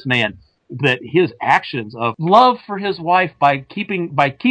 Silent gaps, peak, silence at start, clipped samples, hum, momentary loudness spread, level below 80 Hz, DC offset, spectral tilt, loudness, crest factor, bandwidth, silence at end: none; -2 dBFS; 0.05 s; under 0.1%; none; 11 LU; -58 dBFS; under 0.1%; -6.5 dB/octave; -17 LUFS; 16 dB; 9.2 kHz; 0 s